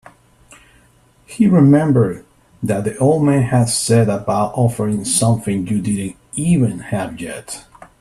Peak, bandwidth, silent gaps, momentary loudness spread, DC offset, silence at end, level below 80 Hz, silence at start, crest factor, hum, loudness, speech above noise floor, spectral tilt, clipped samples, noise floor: 0 dBFS; 13.5 kHz; none; 15 LU; under 0.1%; 0.4 s; -48 dBFS; 1.3 s; 16 dB; none; -16 LUFS; 37 dB; -6 dB/octave; under 0.1%; -52 dBFS